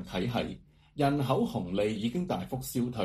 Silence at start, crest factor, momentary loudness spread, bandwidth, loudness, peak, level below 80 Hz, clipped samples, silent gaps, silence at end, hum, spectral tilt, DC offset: 0 s; 18 dB; 8 LU; 15.5 kHz; -31 LUFS; -12 dBFS; -54 dBFS; under 0.1%; none; 0 s; none; -6.5 dB/octave; under 0.1%